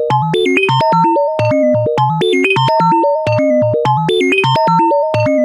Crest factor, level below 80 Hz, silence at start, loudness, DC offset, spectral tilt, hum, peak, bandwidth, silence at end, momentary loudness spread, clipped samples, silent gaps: 10 dB; -52 dBFS; 0 s; -12 LUFS; under 0.1%; -6.5 dB/octave; none; -2 dBFS; 15.5 kHz; 0 s; 2 LU; under 0.1%; none